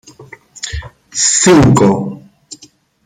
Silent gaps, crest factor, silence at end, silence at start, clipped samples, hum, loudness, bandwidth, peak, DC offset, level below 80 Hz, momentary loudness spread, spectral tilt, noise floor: none; 14 dB; 0.5 s; 0.2 s; under 0.1%; none; -10 LUFS; 15 kHz; 0 dBFS; under 0.1%; -36 dBFS; 18 LU; -4.5 dB/octave; -45 dBFS